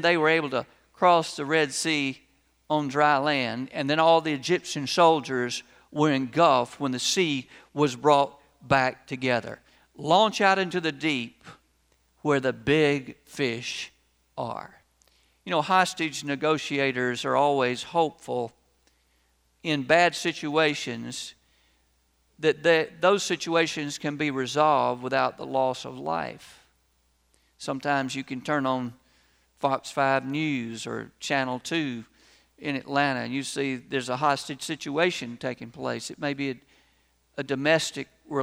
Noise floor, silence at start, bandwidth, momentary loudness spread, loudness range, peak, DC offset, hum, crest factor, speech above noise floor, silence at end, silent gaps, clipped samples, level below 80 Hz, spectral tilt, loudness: -68 dBFS; 0 s; 15.5 kHz; 13 LU; 5 LU; -6 dBFS; under 0.1%; none; 22 dB; 42 dB; 0 s; none; under 0.1%; -66 dBFS; -4 dB/octave; -26 LUFS